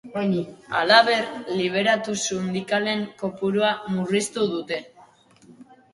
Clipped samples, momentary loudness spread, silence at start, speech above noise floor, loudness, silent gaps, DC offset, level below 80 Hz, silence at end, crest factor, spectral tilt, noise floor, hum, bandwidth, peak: under 0.1%; 12 LU; 0.05 s; 30 dB; -23 LUFS; none; under 0.1%; -66 dBFS; 0.3 s; 22 dB; -4 dB/octave; -53 dBFS; none; 11.5 kHz; -2 dBFS